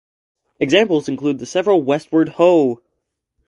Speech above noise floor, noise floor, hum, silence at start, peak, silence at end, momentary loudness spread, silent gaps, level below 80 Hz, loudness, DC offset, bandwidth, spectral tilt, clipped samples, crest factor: 59 dB; -75 dBFS; none; 0.6 s; 0 dBFS; 0.7 s; 8 LU; none; -62 dBFS; -16 LUFS; under 0.1%; 11 kHz; -5.5 dB/octave; under 0.1%; 18 dB